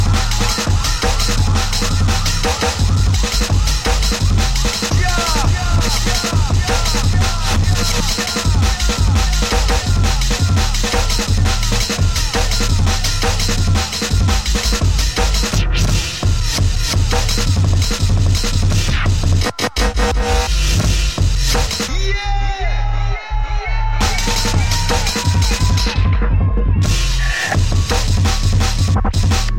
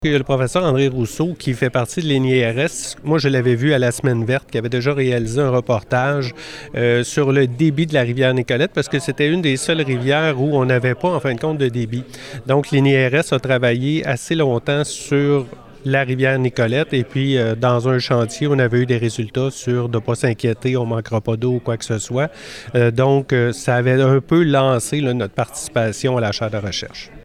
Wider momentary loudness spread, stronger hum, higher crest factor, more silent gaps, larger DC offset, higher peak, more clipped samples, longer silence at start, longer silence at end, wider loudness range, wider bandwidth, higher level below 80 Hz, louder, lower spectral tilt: second, 2 LU vs 6 LU; neither; about the same, 12 dB vs 12 dB; neither; first, 1% vs under 0.1%; about the same, -2 dBFS vs -4 dBFS; neither; about the same, 0 s vs 0 s; about the same, 0 s vs 0.05 s; about the same, 1 LU vs 2 LU; first, 16.5 kHz vs 13.5 kHz; first, -18 dBFS vs -48 dBFS; about the same, -16 LUFS vs -18 LUFS; second, -4 dB/octave vs -6 dB/octave